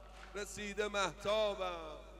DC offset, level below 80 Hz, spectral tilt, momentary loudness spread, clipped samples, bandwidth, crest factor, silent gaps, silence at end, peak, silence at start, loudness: under 0.1%; -56 dBFS; -3 dB/octave; 11 LU; under 0.1%; 14 kHz; 18 dB; none; 0 s; -22 dBFS; 0 s; -38 LUFS